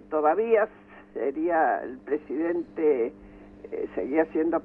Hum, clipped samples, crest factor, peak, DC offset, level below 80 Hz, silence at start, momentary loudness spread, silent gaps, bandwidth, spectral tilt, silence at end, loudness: 50 Hz at -55 dBFS; under 0.1%; 16 dB; -10 dBFS; under 0.1%; -60 dBFS; 0.1 s; 10 LU; none; 3.4 kHz; -9 dB/octave; 0 s; -26 LUFS